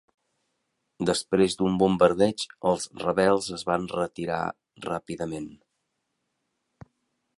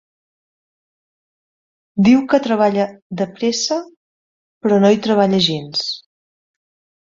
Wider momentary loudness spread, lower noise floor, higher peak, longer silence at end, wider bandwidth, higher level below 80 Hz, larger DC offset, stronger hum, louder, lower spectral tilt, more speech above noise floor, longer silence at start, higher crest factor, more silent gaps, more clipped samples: about the same, 13 LU vs 11 LU; second, -79 dBFS vs under -90 dBFS; about the same, -4 dBFS vs -2 dBFS; first, 1.85 s vs 1.05 s; first, 11.5 kHz vs 7.6 kHz; about the same, -58 dBFS vs -58 dBFS; neither; neither; second, -26 LUFS vs -16 LUFS; about the same, -5 dB/octave vs -5 dB/octave; second, 53 dB vs over 74 dB; second, 1 s vs 1.95 s; about the same, 22 dB vs 18 dB; second, none vs 3.02-3.10 s, 3.96-4.61 s; neither